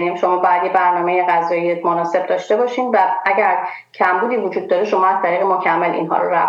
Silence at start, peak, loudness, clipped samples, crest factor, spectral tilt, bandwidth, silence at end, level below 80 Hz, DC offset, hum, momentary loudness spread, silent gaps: 0 s; -2 dBFS; -16 LUFS; under 0.1%; 14 dB; -6 dB/octave; 7.6 kHz; 0 s; -74 dBFS; under 0.1%; none; 4 LU; none